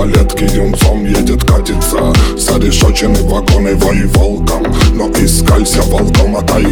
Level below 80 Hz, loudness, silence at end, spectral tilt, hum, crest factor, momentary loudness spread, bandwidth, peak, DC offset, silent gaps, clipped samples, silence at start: -12 dBFS; -11 LUFS; 0 s; -5 dB/octave; none; 8 dB; 3 LU; over 20 kHz; 0 dBFS; under 0.1%; none; 0.3%; 0 s